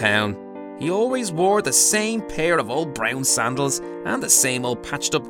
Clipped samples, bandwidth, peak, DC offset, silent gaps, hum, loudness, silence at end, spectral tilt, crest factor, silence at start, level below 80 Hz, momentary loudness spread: under 0.1%; 19 kHz; -2 dBFS; under 0.1%; none; none; -20 LUFS; 0 s; -2.5 dB/octave; 18 dB; 0 s; -52 dBFS; 11 LU